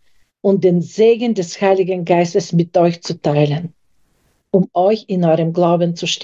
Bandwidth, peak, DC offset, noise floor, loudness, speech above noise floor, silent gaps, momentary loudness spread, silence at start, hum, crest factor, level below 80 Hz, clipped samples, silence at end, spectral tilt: 7.8 kHz; -2 dBFS; under 0.1%; -60 dBFS; -16 LUFS; 46 dB; none; 5 LU; 0.45 s; none; 14 dB; -62 dBFS; under 0.1%; 0 s; -6.5 dB/octave